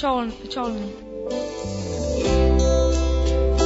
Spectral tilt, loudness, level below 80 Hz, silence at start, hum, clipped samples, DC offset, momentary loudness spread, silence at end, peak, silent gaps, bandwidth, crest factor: -6 dB/octave; -23 LUFS; -24 dBFS; 0 s; none; under 0.1%; under 0.1%; 11 LU; 0 s; -6 dBFS; none; 8 kHz; 16 dB